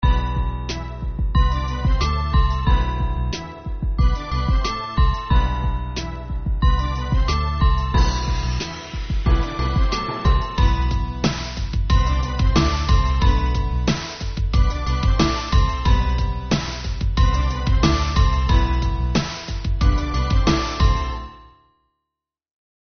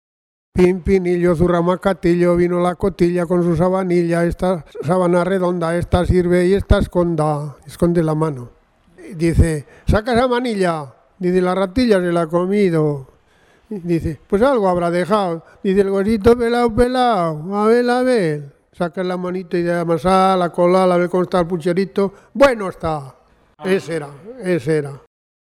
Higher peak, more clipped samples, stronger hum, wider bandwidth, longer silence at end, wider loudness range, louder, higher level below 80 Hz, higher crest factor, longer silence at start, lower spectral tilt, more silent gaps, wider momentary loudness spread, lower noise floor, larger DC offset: second, -4 dBFS vs 0 dBFS; neither; neither; second, 6.6 kHz vs 13 kHz; first, 1.45 s vs 0.55 s; about the same, 2 LU vs 3 LU; second, -21 LUFS vs -17 LUFS; first, -20 dBFS vs -32 dBFS; about the same, 16 dB vs 16 dB; second, 0 s vs 0.55 s; second, -5 dB/octave vs -7.5 dB/octave; neither; about the same, 8 LU vs 9 LU; first, -84 dBFS vs -54 dBFS; neither